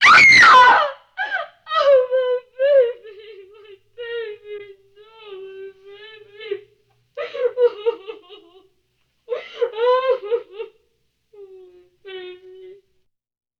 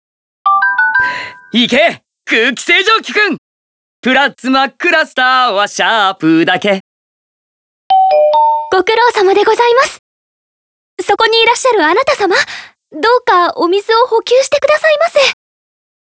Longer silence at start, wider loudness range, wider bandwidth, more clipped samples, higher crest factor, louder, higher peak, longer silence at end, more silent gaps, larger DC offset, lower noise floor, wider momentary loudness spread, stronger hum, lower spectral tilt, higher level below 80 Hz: second, 0 s vs 0.45 s; first, 19 LU vs 1 LU; first, 11 kHz vs 8 kHz; second, under 0.1% vs 0.2%; about the same, 16 dB vs 12 dB; second, -15 LUFS vs -11 LUFS; second, -4 dBFS vs 0 dBFS; first, 1.25 s vs 0.8 s; second, none vs 3.38-4.03 s, 6.80-7.90 s, 9.99-10.97 s; neither; second, -68 dBFS vs under -90 dBFS; first, 28 LU vs 7 LU; neither; second, -1.5 dB/octave vs -3 dB/octave; about the same, -58 dBFS vs -56 dBFS